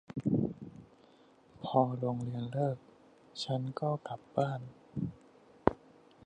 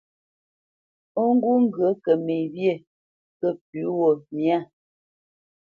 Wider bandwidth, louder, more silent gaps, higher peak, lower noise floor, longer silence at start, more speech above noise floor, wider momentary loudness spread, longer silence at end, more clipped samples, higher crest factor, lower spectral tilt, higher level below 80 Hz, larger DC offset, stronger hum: first, 9.6 kHz vs 4.6 kHz; second, -35 LUFS vs -23 LUFS; second, none vs 2.87-3.40 s, 3.61-3.73 s; about the same, -6 dBFS vs -6 dBFS; second, -62 dBFS vs under -90 dBFS; second, 0.15 s vs 1.15 s; second, 28 dB vs over 68 dB; first, 15 LU vs 8 LU; second, 0.5 s vs 1.1 s; neither; first, 30 dB vs 18 dB; second, -8 dB/octave vs -9.5 dB/octave; first, -62 dBFS vs -76 dBFS; neither; neither